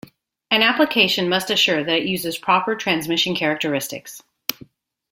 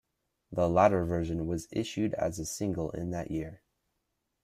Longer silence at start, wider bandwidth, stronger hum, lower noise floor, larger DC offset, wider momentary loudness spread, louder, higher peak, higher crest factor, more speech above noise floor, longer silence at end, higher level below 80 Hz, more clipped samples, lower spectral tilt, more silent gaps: about the same, 0.5 s vs 0.5 s; about the same, 16.5 kHz vs 15.5 kHz; neither; second, -48 dBFS vs -81 dBFS; neither; about the same, 12 LU vs 12 LU; first, -19 LUFS vs -31 LUFS; first, 0 dBFS vs -10 dBFS; about the same, 22 dB vs 22 dB; second, 28 dB vs 51 dB; second, 0.6 s vs 0.85 s; second, -62 dBFS vs -54 dBFS; neither; second, -3 dB/octave vs -6 dB/octave; neither